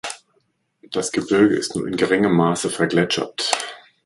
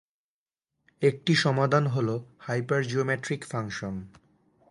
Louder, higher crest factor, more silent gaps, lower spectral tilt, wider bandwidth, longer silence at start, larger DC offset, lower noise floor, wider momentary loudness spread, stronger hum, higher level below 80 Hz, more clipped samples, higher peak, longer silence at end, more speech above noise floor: first, -20 LUFS vs -27 LUFS; about the same, 20 dB vs 20 dB; neither; second, -4.5 dB/octave vs -6 dB/octave; about the same, 11.5 kHz vs 11.5 kHz; second, 0.05 s vs 1 s; neither; second, -67 dBFS vs under -90 dBFS; about the same, 11 LU vs 11 LU; neither; about the same, -58 dBFS vs -62 dBFS; neither; first, 0 dBFS vs -8 dBFS; second, 0.25 s vs 0.65 s; second, 47 dB vs over 63 dB